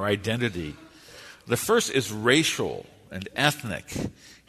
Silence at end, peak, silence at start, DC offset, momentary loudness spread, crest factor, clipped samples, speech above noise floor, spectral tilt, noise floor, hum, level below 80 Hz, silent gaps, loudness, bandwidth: 0.15 s; -4 dBFS; 0 s; under 0.1%; 20 LU; 22 dB; under 0.1%; 21 dB; -3.5 dB/octave; -47 dBFS; none; -54 dBFS; none; -25 LUFS; 13.5 kHz